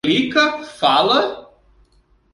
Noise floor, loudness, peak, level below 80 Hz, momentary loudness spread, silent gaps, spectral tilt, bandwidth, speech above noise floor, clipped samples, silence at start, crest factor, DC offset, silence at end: -57 dBFS; -16 LUFS; -2 dBFS; -56 dBFS; 9 LU; none; -4 dB/octave; 11.5 kHz; 40 dB; under 0.1%; 0.05 s; 16 dB; under 0.1%; 0.9 s